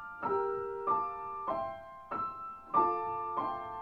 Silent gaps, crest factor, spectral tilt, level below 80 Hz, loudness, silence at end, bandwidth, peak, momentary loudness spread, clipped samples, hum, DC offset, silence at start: none; 18 dB; -8 dB/octave; -68 dBFS; -35 LUFS; 0 s; 5.8 kHz; -16 dBFS; 10 LU; under 0.1%; none; under 0.1%; 0 s